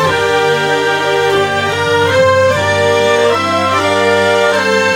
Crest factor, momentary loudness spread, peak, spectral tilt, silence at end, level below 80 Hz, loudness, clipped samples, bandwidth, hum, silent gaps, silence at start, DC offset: 12 dB; 3 LU; 0 dBFS; -4 dB/octave; 0 s; -48 dBFS; -11 LUFS; under 0.1%; 17.5 kHz; none; none; 0 s; under 0.1%